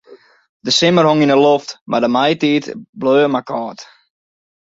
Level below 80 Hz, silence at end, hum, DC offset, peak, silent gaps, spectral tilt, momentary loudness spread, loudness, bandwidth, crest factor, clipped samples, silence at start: -60 dBFS; 0.9 s; none; under 0.1%; -2 dBFS; 0.49-0.60 s, 1.81-1.86 s, 2.89-2.93 s; -5 dB/octave; 13 LU; -14 LUFS; 7.8 kHz; 14 dB; under 0.1%; 0.1 s